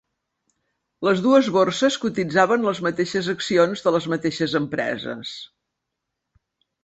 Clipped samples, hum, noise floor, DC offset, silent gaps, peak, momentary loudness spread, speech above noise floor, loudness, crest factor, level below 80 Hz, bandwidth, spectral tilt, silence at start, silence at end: under 0.1%; none; -81 dBFS; under 0.1%; none; -2 dBFS; 11 LU; 60 dB; -21 LUFS; 20 dB; -62 dBFS; 8.2 kHz; -5 dB/octave; 1 s; 1.4 s